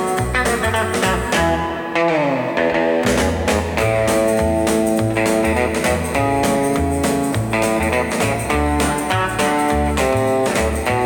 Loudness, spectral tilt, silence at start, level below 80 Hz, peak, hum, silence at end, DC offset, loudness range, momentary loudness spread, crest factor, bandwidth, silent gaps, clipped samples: -18 LUFS; -5 dB/octave; 0 s; -30 dBFS; -4 dBFS; none; 0 s; under 0.1%; 1 LU; 2 LU; 14 dB; 18 kHz; none; under 0.1%